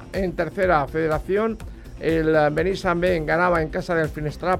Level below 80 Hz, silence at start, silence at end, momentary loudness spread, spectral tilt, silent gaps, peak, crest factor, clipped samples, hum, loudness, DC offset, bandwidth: -38 dBFS; 0 s; 0 s; 8 LU; -7 dB/octave; none; -6 dBFS; 16 dB; under 0.1%; none; -22 LUFS; under 0.1%; 15.5 kHz